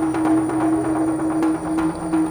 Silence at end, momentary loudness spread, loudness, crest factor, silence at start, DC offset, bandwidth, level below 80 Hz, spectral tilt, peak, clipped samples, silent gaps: 0 s; 3 LU; -20 LUFS; 12 dB; 0 s; under 0.1%; 19.5 kHz; -46 dBFS; -6.5 dB/octave; -8 dBFS; under 0.1%; none